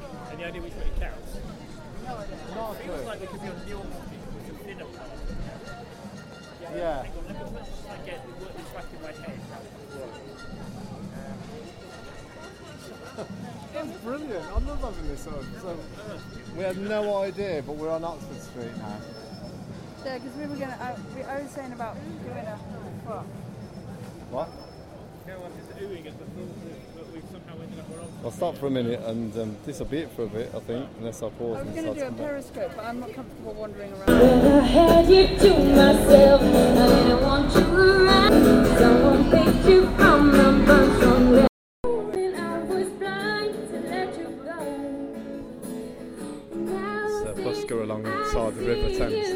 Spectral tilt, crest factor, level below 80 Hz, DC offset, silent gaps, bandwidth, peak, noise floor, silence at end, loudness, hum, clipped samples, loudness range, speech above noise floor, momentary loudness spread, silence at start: -6 dB/octave; 22 dB; -36 dBFS; under 0.1%; 41.49-41.84 s; 17 kHz; 0 dBFS; -43 dBFS; 0 s; -20 LUFS; none; under 0.1%; 23 LU; 21 dB; 25 LU; 0 s